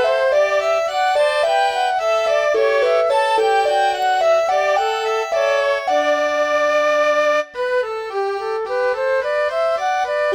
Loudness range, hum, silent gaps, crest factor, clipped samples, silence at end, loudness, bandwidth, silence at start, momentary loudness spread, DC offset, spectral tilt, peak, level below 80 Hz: 2 LU; none; none; 10 dB; under 0.1%; 0 s; -17 LUFS; 14 kHz; 0 s; 5 LU; under 0.1%; -1 dB/octave; -6 dBFS; -58 dBFS